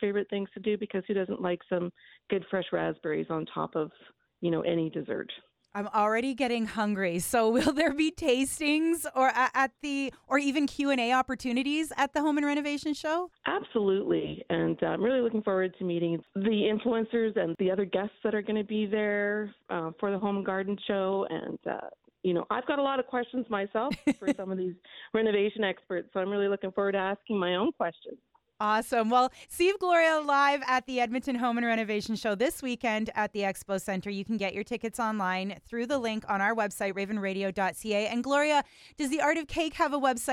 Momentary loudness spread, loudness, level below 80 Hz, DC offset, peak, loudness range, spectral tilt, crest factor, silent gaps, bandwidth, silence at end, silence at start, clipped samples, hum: 8 LU; -29 LUFS; -62 dBFS; under 0.1%; -12 dBFS; 5 LU; -4.5 dB/octave; 18 dB; none; 18 kHz; 0 s; 0 s; under 0.1%; none